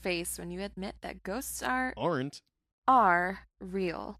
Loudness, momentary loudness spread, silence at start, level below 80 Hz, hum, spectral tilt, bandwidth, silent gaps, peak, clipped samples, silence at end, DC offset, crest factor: -31 LUFS; 16 LU; 0 s; -56 dBFS; none; -4 dB/octave; 15 kHz; 2.72-2.82 s; -12 dBFS; under 0.1%; 0 s; under 0.1%; 20 dB